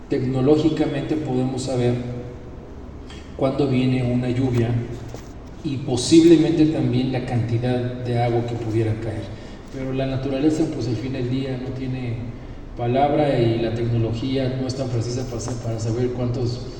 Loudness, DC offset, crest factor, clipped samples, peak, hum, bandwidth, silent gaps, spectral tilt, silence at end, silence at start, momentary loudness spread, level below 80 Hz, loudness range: -22 LUFS; under 0.1%; 18 dB; under 0.1%; -2 dBFS; none; 17 kHz; none; -7 dB/octave; 0 s; 0 s; 17 LU; -40 dBFS; 6 LU